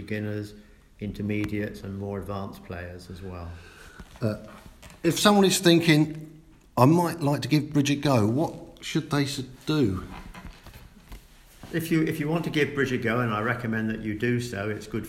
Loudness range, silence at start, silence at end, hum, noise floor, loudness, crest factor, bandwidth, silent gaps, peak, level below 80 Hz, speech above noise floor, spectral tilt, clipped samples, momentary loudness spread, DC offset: 12 LU; 0 s; 0 s; none; -49 dBFS; -25 LUFS; 24 dB; 16 kHz; none; -2 dBFS; -52 dBFS; 23 dB; -5.5 dB/octave; under 0.1%; 20 LU; under 0.1%